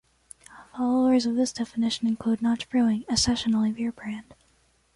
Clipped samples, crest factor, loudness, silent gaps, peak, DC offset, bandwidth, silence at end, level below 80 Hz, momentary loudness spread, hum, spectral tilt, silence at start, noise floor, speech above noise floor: under 0.1%; 16 dB; -25 LUFS; none; -10 dBFS; under 0.1%; 11.5 kHz; 0.75 s; -52 dBFS; 11 LU; none; -4 dB/octave; 0.5 s; -65 dBFS; 39 dB